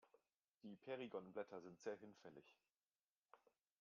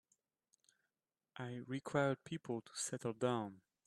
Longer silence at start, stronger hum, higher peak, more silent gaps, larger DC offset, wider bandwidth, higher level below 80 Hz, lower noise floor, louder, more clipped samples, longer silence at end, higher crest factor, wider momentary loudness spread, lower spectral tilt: second, 0.05 s vs 1.35 s; neither; second, -36 dBFS vs -22 dBFS; first, 0.44-0.48 s, 0.54-0.61 s, 2.86-2.99 s, 3.10-3.22 s vs none; neither; second, 7 kHz vs 13 kHz; second, under -90 dBFS vs -82 dBFS; about the same, under -90 dBFS vs under -90 dBFS; second, -55 LUFS vs -42 LUFS; neither; first, 0.45 s vs 0.25 s; about the same, 22 dB vs 22 dB; about the same, 13 LU vs 12 LU; about the same, -4.5 dB/octave vs -5 dB/octave